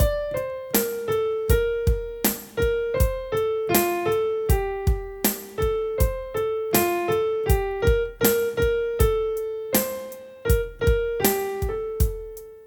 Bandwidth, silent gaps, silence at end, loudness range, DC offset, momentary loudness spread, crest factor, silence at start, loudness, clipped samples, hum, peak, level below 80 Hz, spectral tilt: 19 kHz; none; 0 s; 2 LU; under 0.1%; 6 LU; 18 dB; 0 s; -24 LUFS; under 0.1%; none; -4 dBFS; -30 dBFS; -5 dB/octave